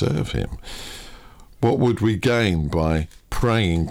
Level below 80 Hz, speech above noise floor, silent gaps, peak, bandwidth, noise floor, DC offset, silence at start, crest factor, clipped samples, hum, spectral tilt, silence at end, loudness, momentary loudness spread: -34 dBFS; 23 dB; none; -6 dBFS; 16 kHz; -43 dBFS; under 0.1%; 0 s; 16 dB; under 0.1%; none; -6.5 dB/octave; 0 s; -21 LUFS; 15 LU